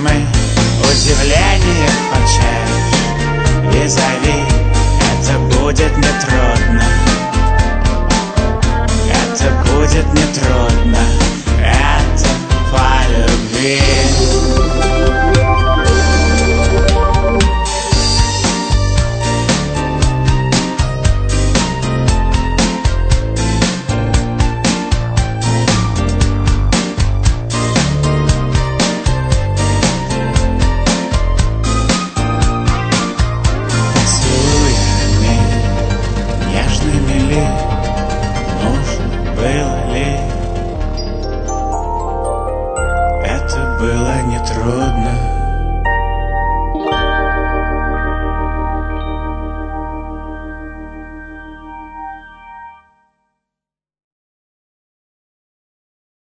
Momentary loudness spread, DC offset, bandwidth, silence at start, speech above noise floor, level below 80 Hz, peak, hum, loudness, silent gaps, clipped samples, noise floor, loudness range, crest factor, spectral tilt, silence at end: 8 LU; under 0.1%; 9.2 kHz; 0 s; 74 dB; -16 dBFS; 0 dBFS; none; -14 LUFS; none; under 0.1%; -85 dBFS; 7 LU; 12 dB; -4.5 dB/octave; 3.65 s